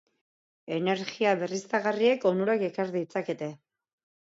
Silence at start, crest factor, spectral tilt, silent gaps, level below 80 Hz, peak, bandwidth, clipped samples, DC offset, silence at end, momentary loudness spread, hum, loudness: 0.65 s; 18 dB; -5.5 dB/octave; none; -80 dBFS; -12 dBFS; 8 kHz; under 0.1%; under 0.1%; 0.8 s; 10 LU; none; -28 LUFS